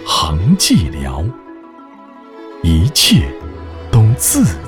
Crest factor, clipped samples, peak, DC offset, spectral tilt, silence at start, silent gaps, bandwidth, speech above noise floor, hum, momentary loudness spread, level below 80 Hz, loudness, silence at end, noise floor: 14 dB; under 0.1%; 0 dBFS; under 0.1%; -4.5 dB/octave; 0 s; none; 19.5 kHz; 24 dB; none; 20 LU; -26 dBFS; -13 LUFS; 0 s; -37 dBFS